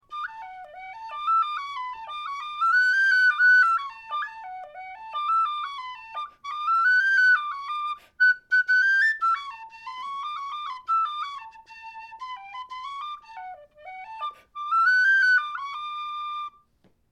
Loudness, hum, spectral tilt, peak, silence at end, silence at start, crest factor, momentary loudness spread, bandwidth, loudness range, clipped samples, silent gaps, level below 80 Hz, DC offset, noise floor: -22 LUFS; none; 1.5 dB/octave; -12 dBFS; 0.65 s; 0.1 s; 14 dB; 22 LU; 11 kHz; 11 LU; under 0.1%; none; -72 dBFS; under 0.1%; -64 dBFS